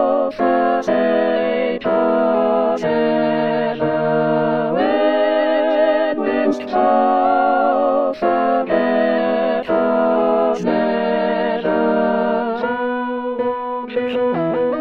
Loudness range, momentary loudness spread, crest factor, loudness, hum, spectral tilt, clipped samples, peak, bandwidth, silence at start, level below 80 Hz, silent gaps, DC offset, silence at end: 3 LU; 5 LU; 14 dB; -17 LUFS; none; -7 dB/octave; under 0.1%; -2 dBFS; 6.8 kHz; 0 s; -56 dBFS; none; 0.5%; 0 s